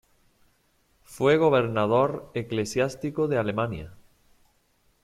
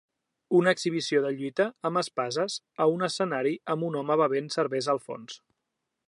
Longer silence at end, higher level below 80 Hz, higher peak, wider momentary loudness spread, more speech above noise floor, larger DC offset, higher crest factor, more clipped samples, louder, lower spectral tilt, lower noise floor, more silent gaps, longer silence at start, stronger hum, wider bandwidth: first, 1.1 s vs 0.7 s; first, -58 dBFS vs -80 dBFS; about the same, -8 dBFS vs -10 dBFS; first, 11 LU vs 7 LU; second, 42 dB vs 56 dB; neither; about the same, 20 dB vs 20 dB; neither; about the same, -25 LUFS vs -27 LUFS; about the same, -6 dB/octave vs -5 dB/octave; second, -67 dBFS vs -83 dBFS; neither; first, 1.1 s vs 0.5 s; neither; first, 15 kHz vs 11.5 kHz